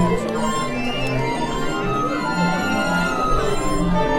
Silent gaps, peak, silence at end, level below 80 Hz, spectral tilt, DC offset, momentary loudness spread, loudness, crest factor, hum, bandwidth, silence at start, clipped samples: none; -4 dBFS; 0 s; -30 dBFS; -5.5 dB/octave; under 0.1%; 3 LU; -21 LUFS; 16 dB; none; 16.5 kHz; 0 s; under 0.1%